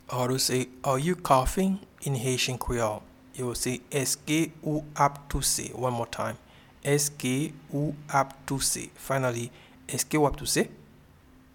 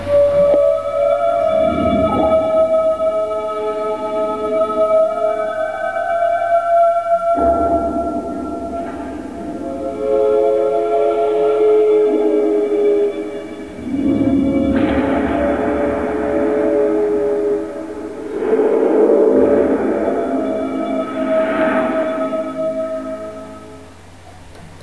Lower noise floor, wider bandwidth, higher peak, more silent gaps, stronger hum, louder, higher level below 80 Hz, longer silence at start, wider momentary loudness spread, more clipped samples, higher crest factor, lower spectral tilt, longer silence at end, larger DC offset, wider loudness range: first, -55 dBFS vs -39 dBFS; first, 19 kHz vs 11 kHz; second, -6 dBFS vs -2 dBFS; neither; neither; second, -28 LUFS vs -16 LUFS; second, -46 dBFS vs -40 dBFS; about the same, 0.1 s vs 0 s; second, 9 LU vs 12 LU; neither; first, 22 dB vs 14 dB; second, -4 dB/octave vs -7.5 dB/octave; first, 0.75 s vs 0 s; second, under 0.1% vs 0.5%; about the same, 2 LU vs 4 LU